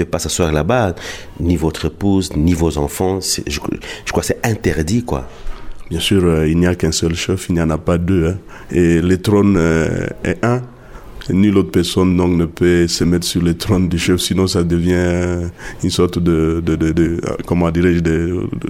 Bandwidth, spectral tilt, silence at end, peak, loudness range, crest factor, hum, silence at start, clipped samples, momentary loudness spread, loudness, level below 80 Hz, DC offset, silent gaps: 16 kHz; -5.5 dB/octave; 0 s; -2 dBFS; 3 LU; 12 dB; none; 0 s; under 0.1%; 9 LU; -16 LUFS; -30 dBFS; under 0.1%; none